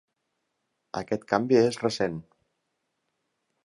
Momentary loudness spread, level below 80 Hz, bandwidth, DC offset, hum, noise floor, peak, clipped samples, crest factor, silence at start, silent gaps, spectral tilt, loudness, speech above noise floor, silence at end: 15 LU; -64 dBFS; 11.5 kHz; under 0.1%; none; -79 dBFS; -6 dBFS; under 0.1%; 22 dB; 0.95 s; none; -5.5 dB/octave; -26 LUFS; 54 dB; 1.45 s